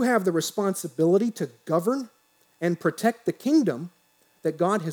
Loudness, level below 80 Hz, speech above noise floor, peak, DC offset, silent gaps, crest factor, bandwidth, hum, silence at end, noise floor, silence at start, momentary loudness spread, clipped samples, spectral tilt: -25 LUFS; -84 dBFS; 39 dB; -8 dBFS; under 0.1%; none; 18 dB; over 20 kHz; none; 0 s; -63 dBFS; 0 s; 9 LU; under 0.1%; -5.5 dB/octave